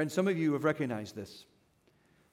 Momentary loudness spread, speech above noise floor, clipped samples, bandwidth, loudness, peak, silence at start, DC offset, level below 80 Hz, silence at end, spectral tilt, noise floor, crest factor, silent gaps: 18 LU; 37 dB; under 0.1%; 16 kHz; -32 LUFS; -16 dBFS; 0 s; under 0.1%; -78 dBFS; 0.9 s; -6.5 dB/octave; -69 dBFS; 18 dB; none